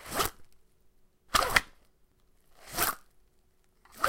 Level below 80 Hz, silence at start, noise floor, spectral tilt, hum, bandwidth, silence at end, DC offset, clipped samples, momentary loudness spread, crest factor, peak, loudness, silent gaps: -50 dBFS; 0 s; -66 dBFS; -1.5 dB/octave; none; 17 kHz; 0 s; under 0.1%; under 0.1%; 12 LU; 32 dB; -2 dBFS; -29 LUFS; none